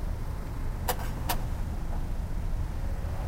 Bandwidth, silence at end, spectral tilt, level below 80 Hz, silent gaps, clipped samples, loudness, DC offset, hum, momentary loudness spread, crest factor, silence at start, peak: 16 kHz; 0 s; -5 dB/octave; -32 dBFS; none; under 0.1%; -35 LUFS; under 0.1%; none; 4 LU; 18 dB; 0 s; -12 dBFS